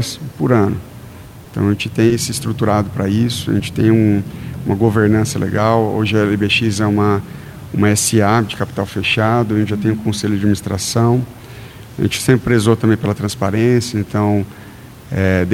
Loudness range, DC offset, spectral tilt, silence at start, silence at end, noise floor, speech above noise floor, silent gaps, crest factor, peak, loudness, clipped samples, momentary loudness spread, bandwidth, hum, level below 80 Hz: 2 LU; under 0.1%; -5.5 dB/octave; 0 s; 0 s; -35 dBFS; 20 dB; none; 16 dB; 0 dBFS; -16 LUFS; under 0.1%; 14 LU; 16 kHz; none; -42 dBFS